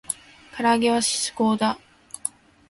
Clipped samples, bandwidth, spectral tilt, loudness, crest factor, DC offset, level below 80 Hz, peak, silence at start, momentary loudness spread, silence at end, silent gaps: under 0.1%; 11.5 kHz; -3 dB/octave; -23 LUFS; 18 dB; under 0.1%; -62 dBFS; -8 dBFS; 0.1 s; 15 LU; 0.4 s; none